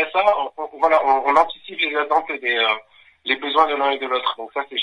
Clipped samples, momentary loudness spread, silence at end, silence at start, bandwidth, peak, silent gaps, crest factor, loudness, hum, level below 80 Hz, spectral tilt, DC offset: under 0.1%; 9 LU; 0 s; 0 s; 10.5 kHz; -2 dBFS; none; 18 dB; -20 LUFS; none; -62 dBFS; -2.5 dB/octave; under 0.1%